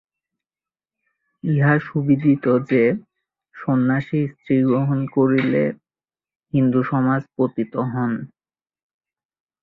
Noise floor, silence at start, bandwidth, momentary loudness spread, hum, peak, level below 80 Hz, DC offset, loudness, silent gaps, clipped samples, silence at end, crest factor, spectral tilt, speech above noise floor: under -90 dBFS; 1.45 s; 4.7 kHz; 8 LU; none; -4 dBFS; -60 dBFS; under 0.1%; -20 LUFS; 6.36-6.40 s; under 0.1%; 1.35 s; 16 dB; -11 dB/octave; over 71 dB